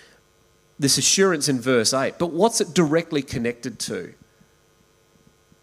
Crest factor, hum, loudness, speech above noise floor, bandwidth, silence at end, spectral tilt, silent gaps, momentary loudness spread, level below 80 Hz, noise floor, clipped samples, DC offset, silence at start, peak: 20 dB; none; -21 LUFS; 38 dB; 16 kHz; 1.5 s; -3.5 dB/octave; none; 12 LU; -58 dBFS; -59 dBFS; under 0.1%; under 0.1%; 0.8 s; -4 dBFS